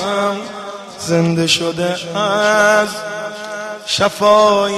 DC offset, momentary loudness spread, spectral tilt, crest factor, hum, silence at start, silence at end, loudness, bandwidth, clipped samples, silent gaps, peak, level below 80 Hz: under 0.1%; 15 LU; -4 dB/octave; 14 dB; none; 0 s; 0 s; -15 LUFS; 13.5 kHz; under 0.1%; none; -2 dBFS; -54 dBFS